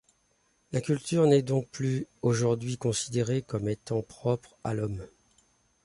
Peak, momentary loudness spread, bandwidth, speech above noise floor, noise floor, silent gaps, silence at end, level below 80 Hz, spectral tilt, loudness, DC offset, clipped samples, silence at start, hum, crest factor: -10 dBFS; 10 LU; 11.5 kHz; 42 dB; -70 dBFS; none; 0.8 s; -58 dBFS; -6 dB/octave; -29 LUFS; under 0.1%; under 0.1%; 0.7 s; none; 18 dB